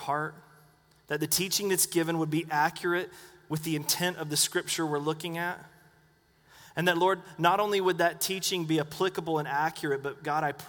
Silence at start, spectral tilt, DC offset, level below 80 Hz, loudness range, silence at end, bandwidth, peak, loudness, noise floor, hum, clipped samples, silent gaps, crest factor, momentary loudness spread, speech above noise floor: 0 s; -3.5 dB/octave; under 0.1%; -70 dBFS; 3 LU; 0 s; over 20 kHz; -8 dBFS; -29 LUFS; -64 dBFS; none; under 0.1%; none; 22 dB; 8 LU; 35 dB